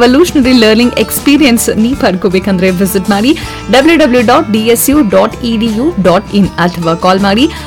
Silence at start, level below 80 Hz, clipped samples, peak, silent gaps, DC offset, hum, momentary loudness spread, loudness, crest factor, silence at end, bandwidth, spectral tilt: 0 s; -30 dBFS; 0.2%; 0 dBFS; none; under 0.1%; none; 5 LU; -8 LUFS; 8 dB; 0 s; 19.5 kHz; -4.5 dB/octave